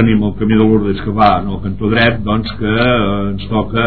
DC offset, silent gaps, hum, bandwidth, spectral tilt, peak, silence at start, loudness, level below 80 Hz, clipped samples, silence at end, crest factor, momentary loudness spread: 4%; none; none; 4.6 kHz; -10 dB/octave; 0 dBFS; 0 s; -14 LUFS; -30 dBFS; 0.1%; 0 s; 14 dB; 6 LU